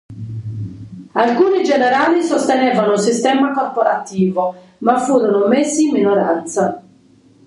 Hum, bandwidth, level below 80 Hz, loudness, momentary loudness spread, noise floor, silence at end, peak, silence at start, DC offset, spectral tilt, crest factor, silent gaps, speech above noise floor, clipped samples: none; 11.5 kHz; -56 dBFS; -15 LUFS; 14 LU; -49 dBFS; 0.65 s; 0 dBFS; 0.1 s; under 0.1%; -5 dB/octave; 16 dB; none; 34 dB; under 0.1%